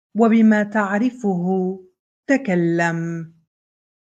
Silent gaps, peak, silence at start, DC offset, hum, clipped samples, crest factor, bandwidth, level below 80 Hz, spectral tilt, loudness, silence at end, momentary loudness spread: 1.99-2.23 s; -4 dBFS; 0.15 s; under 0.1%; none; under 0.1%; 16 dB; 8 kHz; -70 dBFS; -7.5 dB/octave; -19 LUFS; 0.85 s; 17 LU